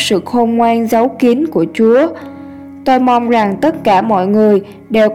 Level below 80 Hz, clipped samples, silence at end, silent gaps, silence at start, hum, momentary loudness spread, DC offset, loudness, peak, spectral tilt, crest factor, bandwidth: -52 dBFS; under 0.1%; 0 s; none; 0 s; none; 8 LU; 0.3%; -12 LUFS; 0 dBFS; -5.5 dB/octave; 12 dB; 15.5 kHz